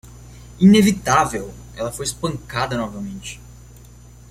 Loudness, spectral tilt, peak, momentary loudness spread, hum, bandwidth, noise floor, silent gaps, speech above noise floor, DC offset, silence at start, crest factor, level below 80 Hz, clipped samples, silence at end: -19 LUFS; -5 dB/octave; -2 dBFS; 20 LU; 60 Hz at -35 dBFS; 15.5 kHz; -43 dBFS; none; 25 dB; under 0.1%; 0.05 s; 18 dB; -42 dBFS; under 0.1%; 0.8 s